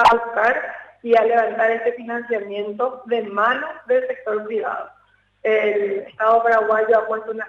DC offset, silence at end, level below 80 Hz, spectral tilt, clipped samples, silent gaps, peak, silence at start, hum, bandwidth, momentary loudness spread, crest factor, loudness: under 0.1%; 0 s; -58 dBFS; -4.5 dB/octave; under 0.1%; none; -6 dBFS; 0 s; none; 9 kHz; 11 LU; 14 dB; -20 LUFS